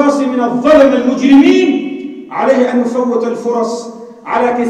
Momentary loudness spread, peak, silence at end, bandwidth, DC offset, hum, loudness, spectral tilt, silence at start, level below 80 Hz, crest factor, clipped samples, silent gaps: 15 LU; 0 dBFS; 0 s; 9.4 kHz; under 0.1%; none; -11 LUFS; -5 dB/octave; 0 s; -50 dBFS; 10 dB; under 0.1%; none